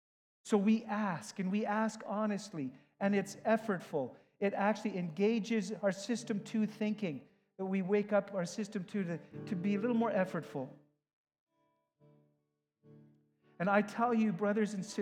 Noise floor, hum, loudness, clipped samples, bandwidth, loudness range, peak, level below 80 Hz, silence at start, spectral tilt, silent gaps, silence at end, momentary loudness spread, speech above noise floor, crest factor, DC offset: -83 dBFS; none; -35 LUFS; under 0.1%; 11.5 kHz; 4 LU; -16 dBFS; -88 dBFS; 0.45 s; -6.5 dB/octave; 11.13-11.25 s, 11.40-11.47 s; 0 s; 10 LU; 49 dB; 20 dB; under 0.1%